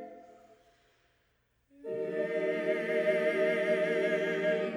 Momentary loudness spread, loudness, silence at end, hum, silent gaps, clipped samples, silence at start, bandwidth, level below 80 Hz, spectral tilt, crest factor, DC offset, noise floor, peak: 9 LU; -31 LUFS; 0 s; none; none; under 0.1%; 0 s; 12 kHz; -78 dBFS; -6 dB/octave; 14 dB; under 0.1%; -74 dBFS; -18 dBFS